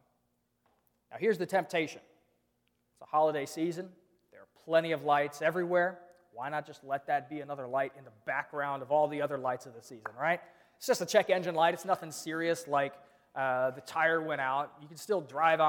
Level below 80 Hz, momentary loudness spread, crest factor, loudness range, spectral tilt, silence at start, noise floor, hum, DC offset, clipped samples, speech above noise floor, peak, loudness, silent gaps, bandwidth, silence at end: -84 dBFS; 14 LU; 22 dB; 4 LU; -4.5 dB/octave; 1.1 s; -77 dBFS; none; under 0.1%; under 0.1%; 46 dB; -10 dBFS; -32 LUFS; none; 19 kHz; 0 s